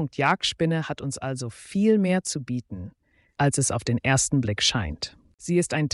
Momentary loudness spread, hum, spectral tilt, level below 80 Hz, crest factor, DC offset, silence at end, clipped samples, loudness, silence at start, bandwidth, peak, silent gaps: 13 LU; none; -4.5 dB/octave; -50 dBFS; 18 dB; under 0.1%; 0.05 s; under 0.1%; -24 LUFS; 0 s; 11.5 kHz; -6 dBFS; 5.34-5.38 s